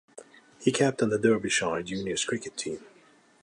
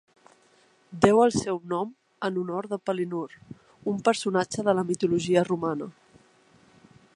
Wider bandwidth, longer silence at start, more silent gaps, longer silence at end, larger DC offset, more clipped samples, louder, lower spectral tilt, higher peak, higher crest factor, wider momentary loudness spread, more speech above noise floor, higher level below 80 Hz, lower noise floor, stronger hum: about the same, 11.5 kHz vs 11.5 kHz; second, 0.15 s vs 0.9 s; neither; second, 0.55 s vs 1.25 s; neither; neither; about the same, -27 LUFS vs -26 LUFS; second, -4 dB/octave vs -5.5 dB/octave; second, -8 dBFS vs -2 dBFS; about the same, 20 dB vs 24 dB; second, 11 LU vs 14 LU; second, 32 dB vs 36 dB; about the same, -64 dBFS vs -62 dBFS; about the same, -59 dBFS vs -61 dBFS; neither